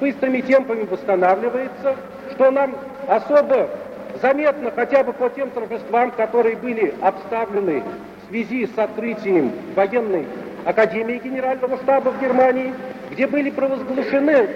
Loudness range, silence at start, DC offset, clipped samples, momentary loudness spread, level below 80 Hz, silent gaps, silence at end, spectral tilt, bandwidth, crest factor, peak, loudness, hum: 3 LU; 0 s; under 0.1%; under 0.1%; 10 LU; -62 dBFS; none; 0 s; -7 dB/octave; 7 kHz; 16 dB; -2 dBFS; -20 LUFS; none